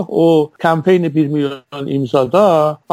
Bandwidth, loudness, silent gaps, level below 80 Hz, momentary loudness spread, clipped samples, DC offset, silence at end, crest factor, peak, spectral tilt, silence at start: 16 kHz; -14 LUFS; none; -60 dBFS; 9 LU; under 0.1%; under 0.1%; 0.2 s; 12 dB; -2 dBFS; -7.5 dB/octave; 0 s